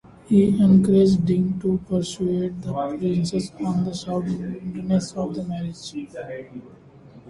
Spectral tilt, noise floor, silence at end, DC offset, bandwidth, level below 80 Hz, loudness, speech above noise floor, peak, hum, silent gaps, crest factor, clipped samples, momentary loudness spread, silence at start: -7.5 dB/octave; -46 dBFS; 0 s; under 0.1%; 11.5 kHz; -50 dBFS; -22 LUFS; 25 dB; -6 dBFS; none; none; 16 dB; under 0.1%; 18 LU; 0.3 s